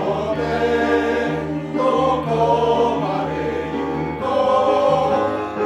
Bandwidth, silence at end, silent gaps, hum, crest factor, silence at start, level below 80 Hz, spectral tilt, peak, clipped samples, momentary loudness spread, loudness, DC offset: 11.5 kHz; 0 s; none; none; 14 dB; 0 s; -44 dBFS; -6.5 dB/octave; -4 dBFS; under 0.1%; 7 LU; -19 LUFS; under 0.1%